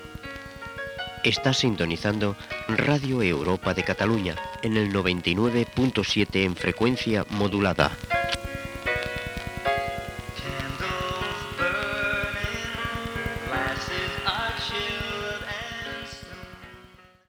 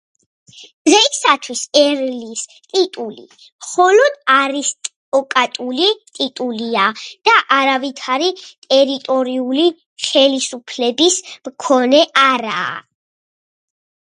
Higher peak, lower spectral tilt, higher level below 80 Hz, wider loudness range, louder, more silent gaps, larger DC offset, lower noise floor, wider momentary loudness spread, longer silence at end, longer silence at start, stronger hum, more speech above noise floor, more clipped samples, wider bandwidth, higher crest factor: about the same, -2 dBFS vs 0 dBFS; first, -5 dB/octave vs -1 dB/octave; first, -44 dBFS vs -72 dBFS; first, 5 LU vs 2 LU; second, -26 LUFS vs -15 LUFS; second, none vs 0.74-0.85 s, 3.52-3.59 s, 4.96-5.12 s, 8.58-8.62 s, 9.86-9.96 s; neither; second, -52 dBFS vs under -90 dBFS; about the same, 11 LU vs 12 LU; second, 0.25 s vs 1.25 s; second, 0 s vs 0.55 s; neither; second, 27 dB vs over 74 dB; neither; first, over 20 kHz vs 11.5 kHz; first, 24 dB vs 16 dB